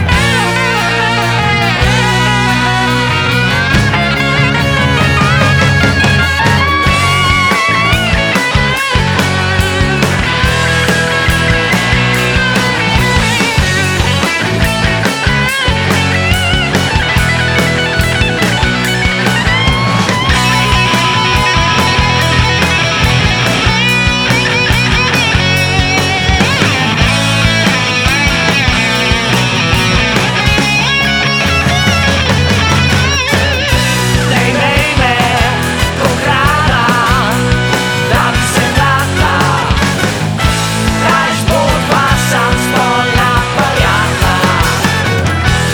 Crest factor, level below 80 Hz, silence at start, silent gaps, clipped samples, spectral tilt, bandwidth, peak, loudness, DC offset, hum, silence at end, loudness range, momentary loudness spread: 10 dB; -22 dBFS; 0 s; none; under 0.1%; -4 dB/octave; over 20 kHz; 0 dBFS; -10 LUFS; under 0.1%; none; 0 s; 1 LU; 2 LU